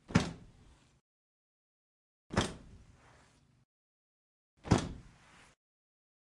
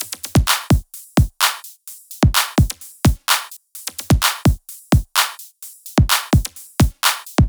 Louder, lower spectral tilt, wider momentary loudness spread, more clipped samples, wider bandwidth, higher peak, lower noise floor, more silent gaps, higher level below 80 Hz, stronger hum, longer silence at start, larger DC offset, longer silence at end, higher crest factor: second, -35 LUFS vs -18 LUFS; first, -5.5 dB/octave vs -4 dB/octave; first, 21 LU vs 15 LU; neither; second, 11.5 kHz vs over 20 kHz; second, -12 dBFS vs 0 dBFS; first, -66 dBFS vs -39 dBFS; first, 1.00-2.30 s, 3.65-4.57 s vs none; second, -54 dBFS vs -26 dBFS; neither; about the same, 0.1 s vs 0 s; neither; first, 1.25 s vs 0 s; first, 28 dB vs 18 dB